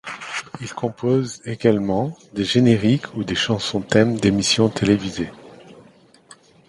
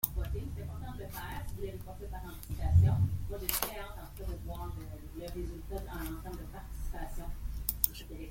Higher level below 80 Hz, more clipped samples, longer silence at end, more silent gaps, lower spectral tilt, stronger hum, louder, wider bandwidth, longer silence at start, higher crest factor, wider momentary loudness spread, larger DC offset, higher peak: second, -50 dBFS vs -42 dBFS; neither; first, 0.95 s vs 0 s; neither; about the same, -5 dB/octave vs -5 dB/octave; neither; first, -20 LUFS vs -37 LUFS; second, 11.5 kHz vs 16.5 kHz; about the same, 0.05 s vs 0.05 s; second, 20 dB vs 32 dB; second, 12 LU vs 15 LU; neither; first, 0 dBFS vs -4 dBFS